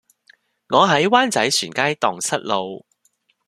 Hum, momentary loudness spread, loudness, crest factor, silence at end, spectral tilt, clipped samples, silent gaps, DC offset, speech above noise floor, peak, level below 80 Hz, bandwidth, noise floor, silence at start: none; 9 LU; -18 LUFS; 20 dB; 0.7 s; -3 dB/octave; under 0.1%; none; under 0.1%; 46 dB; 0 dBFS; -64 dBFS; 14 kHz; -65 dBFS; 0.7 s